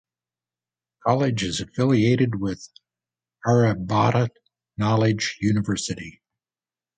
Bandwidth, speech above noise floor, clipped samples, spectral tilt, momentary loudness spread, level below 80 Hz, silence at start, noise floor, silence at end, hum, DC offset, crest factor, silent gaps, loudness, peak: 9.4 kHz; over 69 dB; under 0.1%; -6 dB/octave; 10 LU; -52 dBFS; 1.05 s; under -90 dBFS; 0.9 s; 60 Hz at -40 dBFS; under 0.1%; 20 dB; none; -22 LUFS; -4 dBFS